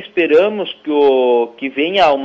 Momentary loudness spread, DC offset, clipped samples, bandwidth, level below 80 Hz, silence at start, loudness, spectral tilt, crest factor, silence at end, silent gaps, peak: 7 LU; under 0.1%; under 0.1%; 7.4 kHz; -58 dBFS; 0 s; -14 LUFS; -5.5 dB/octave; 12 dB; 0 s; none; -2 dBFS